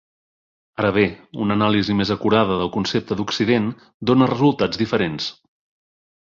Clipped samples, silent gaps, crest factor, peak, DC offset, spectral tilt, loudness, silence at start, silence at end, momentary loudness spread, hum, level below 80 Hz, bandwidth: under 0.1%; 3.94-4.00 s; 18 dB; -4 dBFS; under 0.1%; -6.5 dB/octave; -20 LUFS; 0.8 s; 1 s; 9 LU; none; -50 dBFS; 7.4 kHz